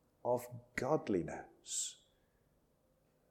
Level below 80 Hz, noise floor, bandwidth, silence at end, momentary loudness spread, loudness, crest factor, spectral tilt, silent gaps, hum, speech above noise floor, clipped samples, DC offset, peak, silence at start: -70 dBFS; -75 dBFS; 18 kHz; 1.35 s; 10 LU; -39 LUFS; 22 dB; -4 dB/octave; none; none; 36 dB; under 0.1%; under 0.1%; -20 dBFS; 0.25 s